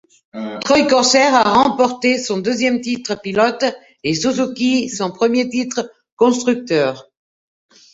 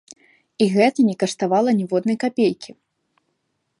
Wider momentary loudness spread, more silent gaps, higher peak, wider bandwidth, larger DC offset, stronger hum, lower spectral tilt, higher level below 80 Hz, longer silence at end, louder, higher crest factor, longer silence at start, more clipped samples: first, 13 LU vs 6 LU; first, 6.12-6.17 s vs none; about the same, -2 dBFS vs -2 dBFS; second, 8 kHz vs 11.5 kHz; neither; neither; second, -3.5 dB/octave vs -6 dB/octave; first, -56 dBFS vs -70 dBFS; second, 0.9 s vs 1.15 s; first, -16 LUFS vs -19 LUFS; about the same, 16 dB vs 18 dB; second, 0.35 s vs 0.6 s; neither